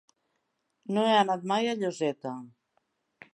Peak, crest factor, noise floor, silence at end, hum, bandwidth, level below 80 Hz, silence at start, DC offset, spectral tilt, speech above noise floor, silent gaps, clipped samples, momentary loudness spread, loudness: -12 dBFS; 20 dB; -78 dBFS; 0.85 s; none; 11.5 kHz; -82 dBFS; 0.9 s; under 0.1%; -5 dB/octave; 51 dB; none; under 0.1%; 16 LU; -28 LUFS